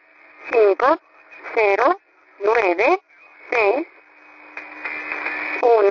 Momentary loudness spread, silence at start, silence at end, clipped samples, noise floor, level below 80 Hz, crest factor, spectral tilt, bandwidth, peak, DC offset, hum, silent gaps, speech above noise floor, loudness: 19 LU; 0.4 s; 0 s; under 0.1%; -47 dBFS; -64 dBFS; 16 dB; -4.5 dB/octave; 6 kHz; -4 dBFS; under 0.1%; none; none; 30 dB; -19 LUFS